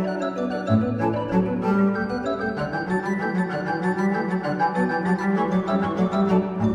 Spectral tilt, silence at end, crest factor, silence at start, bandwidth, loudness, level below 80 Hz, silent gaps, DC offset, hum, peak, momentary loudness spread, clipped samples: -8 dB/octave; 0 s; 14 dB; 0 s; 9.2 kHz; -23 LUFS; -52 dBFS; none; under 0.1%; none; -8 dBFS; 5 LU; under 0.1%